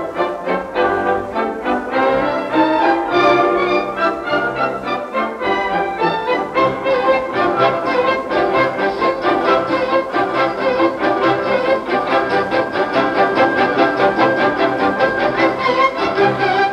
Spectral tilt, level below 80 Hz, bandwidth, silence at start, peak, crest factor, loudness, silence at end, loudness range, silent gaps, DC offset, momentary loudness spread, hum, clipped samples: -6 dB/octave; -48 dBFS; 11 kHz; 0 s; -2 dBFS; 14 dB; -16 LUFS; 0 s; 2 LU; none; under 0.1%; 5 LU; none; under 0.1%